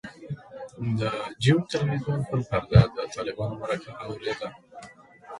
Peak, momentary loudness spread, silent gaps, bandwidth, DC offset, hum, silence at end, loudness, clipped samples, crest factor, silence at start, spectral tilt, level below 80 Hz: -4 dBFS; 19 LU; none; 11.5 kHz; under 0.1%; none; 0 s; -26 LUFS; under 0.1%; 24 dB; 0.05 s; -7 dB/octave; -44 dBFS